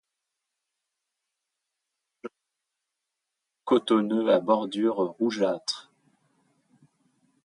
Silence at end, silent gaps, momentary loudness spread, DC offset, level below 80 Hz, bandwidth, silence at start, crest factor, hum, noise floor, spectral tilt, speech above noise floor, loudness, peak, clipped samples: 1.65 s; none; 22 LU; under 0.1%; -80 dBFS; 11 kHz; 2.25 s; 20 dB; none; -85 dBFS; -5 dB/octave; 60 dB; -25 LUFS; -8 dBFS; under 0.1%